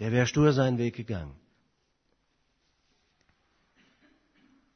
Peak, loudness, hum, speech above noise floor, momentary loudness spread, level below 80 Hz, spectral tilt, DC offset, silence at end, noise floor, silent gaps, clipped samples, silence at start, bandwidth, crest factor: -10 dBFS; -27 LUFS; none; 47 dB; 14 LU; -56 dBFS; -6.5 dB/octave; under 0.1%; 3.45 s; -74 dBFS; none; under 0.1%; 0 s; 6.6 kHz; 22 dB